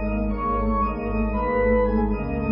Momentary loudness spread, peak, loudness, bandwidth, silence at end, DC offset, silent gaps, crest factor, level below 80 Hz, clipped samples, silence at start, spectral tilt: 5 LU; -10 dBFS; -23 LUFS; 5.4 kHz; 0 s; under 0.1%; none; 12 dB; -28 dBFS; under 0.1%; 0 s; -13 dB/octave